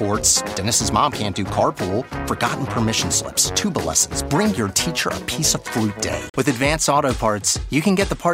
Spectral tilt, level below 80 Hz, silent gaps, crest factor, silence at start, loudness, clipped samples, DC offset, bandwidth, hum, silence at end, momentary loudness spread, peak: -3 dB/octave; -38 dBFS; 6.30-6.34 s; 18 dB; 0 s; -19 LUFS; under 0.1%; under 0.1%; 16 kHz; none; 0 s; 6 LU; -2 dBFS